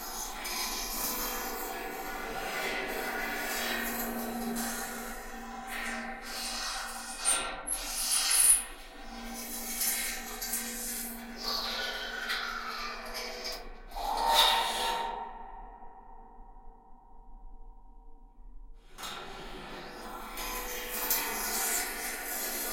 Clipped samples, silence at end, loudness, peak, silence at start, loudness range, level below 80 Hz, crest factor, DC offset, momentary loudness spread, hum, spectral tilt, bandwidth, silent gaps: under 0.1%; 0 s; -31 LUFS; -8 dBFS; 0 s; 15 LU; -50 dBFS; 26 dB; under 0.1%; 17 LU; none; 0 dB/octave; 16.5 kHz; none